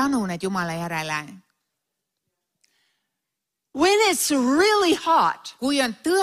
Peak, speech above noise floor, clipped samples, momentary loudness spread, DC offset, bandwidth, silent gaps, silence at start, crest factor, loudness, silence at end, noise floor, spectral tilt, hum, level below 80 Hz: -6 dBFS; 62 dB; under 0.1%; 10 LU; under 0.1%; 15.5 kHz; none; 0 s; 16 dB; -21 LUFS; 0 s; -83 dBFS; -3.5 dB/octave; none; -60 dBFS